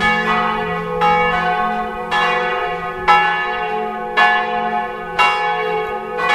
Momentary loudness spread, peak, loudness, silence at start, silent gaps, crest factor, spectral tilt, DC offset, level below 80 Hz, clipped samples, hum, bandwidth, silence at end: 8 LU; 0 dBFS; -17 LUFS; 0 s; none; 16 dB; -4.5 dB/octave; under 0.1%; -44 dBFS; under 0.1%; none; 14 kHz; 0 s